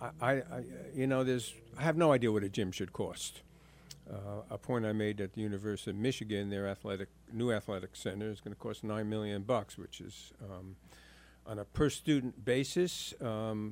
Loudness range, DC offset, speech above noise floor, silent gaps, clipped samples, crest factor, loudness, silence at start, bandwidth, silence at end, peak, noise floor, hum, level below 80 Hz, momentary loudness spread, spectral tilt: 6 LU; under 0.1%; 21 dB; none; under 0.1%; 22 dB; -36 LUFS; 0 s; 16 kHz; 0 s; -14 dBFS; -56 dBFS; none; -60 dBFS; 16 LU; -5.5 dB/octave